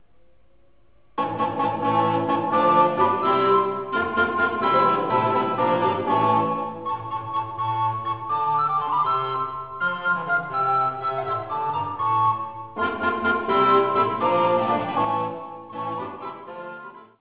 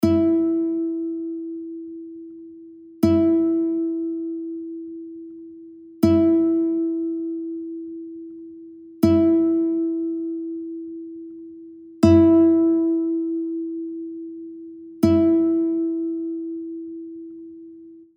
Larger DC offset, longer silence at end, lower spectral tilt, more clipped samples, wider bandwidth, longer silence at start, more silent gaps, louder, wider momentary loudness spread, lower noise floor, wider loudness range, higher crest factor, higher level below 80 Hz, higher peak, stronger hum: first, 0.2% vs under 0.1%; about the same, 0.15 s vs 0.15 s; about the same, -9.5 dB/octave vs -9 dB/octave; neither; second, 4 kHz vs 6.8 kHz; first, 1.15 s vs 0 s; neither; about the same, -22 LUFS vs -21 LUFS; second, 12 LU vs 23 LU; first, -61 dBFS vs -43 dBFS; about the same, 4 LU vs 4 LU; about the same, 18 dB vs 20 dB; about the same, -56 dBFS vs -54 dBFS; second, -6 dBFS vs -2 dBFS; neither